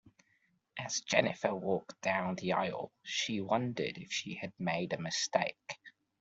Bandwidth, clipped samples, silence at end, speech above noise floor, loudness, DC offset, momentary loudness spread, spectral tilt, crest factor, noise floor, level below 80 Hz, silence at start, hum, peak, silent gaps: 8.2 kHz; under 0.1%; 0.3 s; 40 dB; -35 LUFS; under 0.1%; 12 LU; -3.5 dB/octave; 24 dB; -75 dBFS; -74 dBFS; 0.75 s; none; -12 dBFS; none